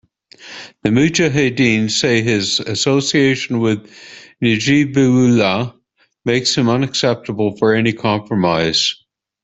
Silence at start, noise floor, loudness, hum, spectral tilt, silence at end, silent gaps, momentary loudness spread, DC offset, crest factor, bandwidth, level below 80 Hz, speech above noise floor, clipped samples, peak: 0.4 s; -56 dBFS; -15 LUFS; none; -4.5 dB/octave; 0.5 s; none; 9 LU; under 0.1%; 16 dB; 8.4 kHz; -52 dBFS; 41 dB; under 0.1%; 0 dBFS